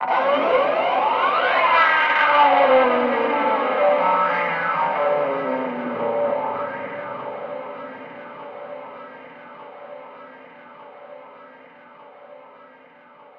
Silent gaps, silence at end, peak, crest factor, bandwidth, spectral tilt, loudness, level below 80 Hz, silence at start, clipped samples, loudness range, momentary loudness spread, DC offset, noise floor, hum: none; 1 s; -4 dBFS; 18 dB; 6.2 kHz; -5.5 dB/octave; -19 LUFS; -68 dBFS; 0 s; under 0.1%; 22 LU; 24 LU; under 0.1%; -48 dBFS; none